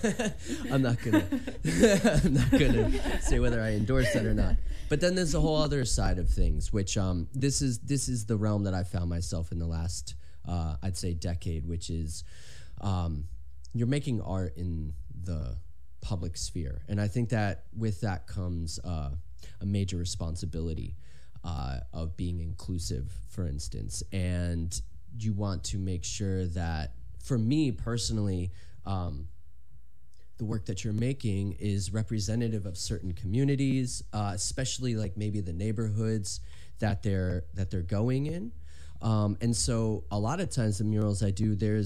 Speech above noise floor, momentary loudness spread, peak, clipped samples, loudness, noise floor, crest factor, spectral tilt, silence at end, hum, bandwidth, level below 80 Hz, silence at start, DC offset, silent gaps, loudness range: 30 dB; 12 LU; -8 dBFS; under 0.1%; -31 LUFS; -60 dBFS; 20 dB; -5.5 dB/octave; 0 s; none; 14 kHz; -38 dBFS; 0 s; 1%; none; 8 LU